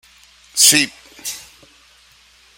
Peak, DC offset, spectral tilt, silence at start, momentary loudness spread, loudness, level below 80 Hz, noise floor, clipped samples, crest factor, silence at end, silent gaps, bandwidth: 0 dBFS; under 0.1%; 0.5 dB/octave; 0.55 s; 20 LU; -13 LUFS; -60 dBFS; -51 dBFS; under 0.1%; 22 dB; 1.2 s; none; over 20 kHz